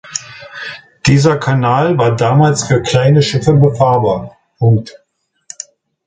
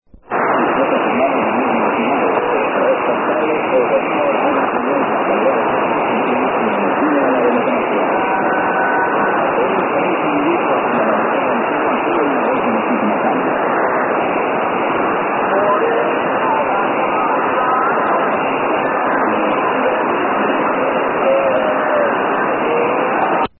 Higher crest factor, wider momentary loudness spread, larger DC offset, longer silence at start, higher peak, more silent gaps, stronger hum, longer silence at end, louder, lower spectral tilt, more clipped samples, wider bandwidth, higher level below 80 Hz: about the same, 12 dB vs 12 dB; first, 19 LU vs 2 LU; neither; about the same, 0.05 s vs 0.15 s; about the same, 0 dBFS vs -2 dBFS; neither; neither; first, 1.15 s vs 0.1 s; first, -12 LUFS vs -15 LUFS; second, -6 dB/octave vs -11 dB/octave; neither; first, 9.4 kHz vs 4.2 kHz; first, -42 dBFS vs -56 dBFS